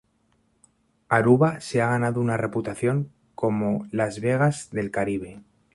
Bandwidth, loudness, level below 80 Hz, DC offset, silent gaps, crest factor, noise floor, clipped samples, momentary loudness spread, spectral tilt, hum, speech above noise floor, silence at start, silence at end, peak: 11.5 kHz; -24 LUFS; -58 dBFS; under 0.1%; none; 20 dB; -67 dBFS; under 0.1%; 9 LU; -7 dB/octave; none; 44 dB; 1.1 s; 0.35 s; -6 dBFS